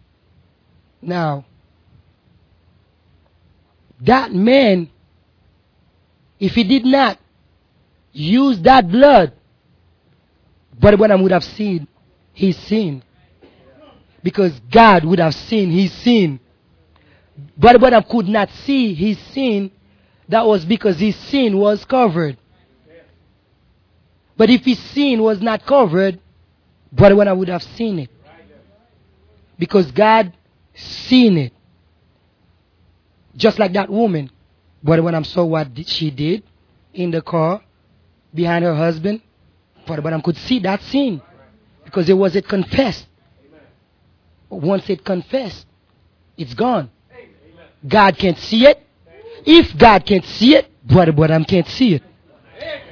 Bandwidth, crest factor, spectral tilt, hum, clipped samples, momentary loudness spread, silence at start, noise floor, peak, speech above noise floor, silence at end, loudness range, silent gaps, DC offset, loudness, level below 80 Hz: 5.4 kHz; 16 dB; -7.5 dB/octave; none; 0.1%; 16 LU; 1.05 s; -57 dBFS; 0 dBFS; 43 dB; 0.15 s; 9 LU; none; under 0.1%; -15 LUFS; -42 dBFS